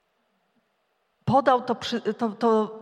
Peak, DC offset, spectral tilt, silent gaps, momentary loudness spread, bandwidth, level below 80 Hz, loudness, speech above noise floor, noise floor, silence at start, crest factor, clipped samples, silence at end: -6 dBFS; under 0.1%; -6 dB/octave; none; 8 LU; 10 kHz; -66 dBFS; -24 LUFS; 49 dB; -72 dBFS; 1.25 s; 20 dB; under 0.1%; 0 s